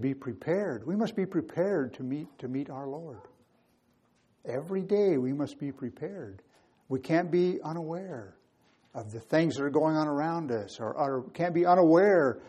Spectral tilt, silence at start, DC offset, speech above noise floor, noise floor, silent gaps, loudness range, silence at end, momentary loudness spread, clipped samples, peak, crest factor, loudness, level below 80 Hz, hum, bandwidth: -7.5 dB/octave; 0 s; under 0.1%; 40 dB; -69 dBFS; none; 7 LU; 0 s; 17 LU; under 0.1%; -10 dBFS; 20 dB; -29 LUFS; -74 dBFS; none; 10 kHz